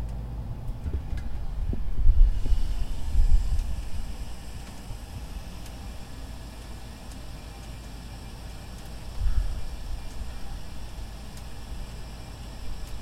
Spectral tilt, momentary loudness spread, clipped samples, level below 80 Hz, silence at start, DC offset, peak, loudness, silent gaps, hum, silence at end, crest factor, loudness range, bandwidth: -5.5 dB/octave; 14 LU; under 0.1%; -28 dBFS; 0 s; under 0.1%; -6 dBFS; -35 LUFS; none; none; 0 s; 20 dB; 11 LU; 12.5 kHz